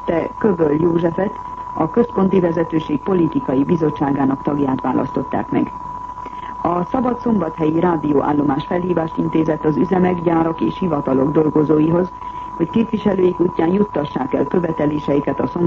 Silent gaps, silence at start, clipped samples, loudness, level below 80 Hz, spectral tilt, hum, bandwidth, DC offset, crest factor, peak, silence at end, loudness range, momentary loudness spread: none; 0 s; under 0.1%; -18 LUFS; -44 dBFS; -9.5 dB/octave; none; 7 kHz; under 0.1%; 14 dB; -4 dBFS; 0 s; 3 LU; 7 LU